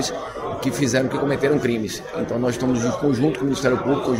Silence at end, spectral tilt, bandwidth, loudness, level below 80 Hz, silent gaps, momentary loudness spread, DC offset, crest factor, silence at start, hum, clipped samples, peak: 0 s; -5.5 dB/octave; 16 kHz; -22 LUFS; -48 dBFS; none; 7 LU; under 0.1%; 16 dB; 0 s; none; under 0.1%; -6 dBFS